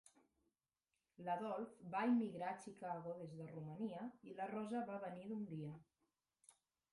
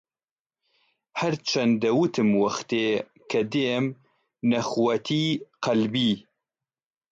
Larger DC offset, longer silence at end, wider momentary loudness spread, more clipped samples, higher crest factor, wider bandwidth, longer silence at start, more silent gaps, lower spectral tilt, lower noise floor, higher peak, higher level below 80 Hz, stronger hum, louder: neither; second, 0.4 s vs 0.95 s; first, 13 LU vs 7 LU; neither; about the same, 18 dB vs 14 dB; first, 11.5 kHz vs 7.8 kHz; about the same, 1.2 s vs 1.15 s; neither; first, -7 dB/octave vs -5.5 dB/octave; about the same, under -90 dBFS vs under -90 dBFS; second, -30 dBFS vs -12 dBFS; second, -86 dBFS vs -68 dBFS; neither; second, -46 LUFS vs -25 LUFS